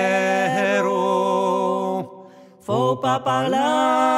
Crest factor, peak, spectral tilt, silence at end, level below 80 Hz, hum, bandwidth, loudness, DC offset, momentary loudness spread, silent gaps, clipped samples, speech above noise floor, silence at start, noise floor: 14 dB; -6 dBFS; -5 dB/octave; 0 s; -70 dBFS; none; 15.5 kHz; -20 LUFS; under 0.1%; 7 LU; none; under 0.1%; 26 dB; 0 s; -45 dBFS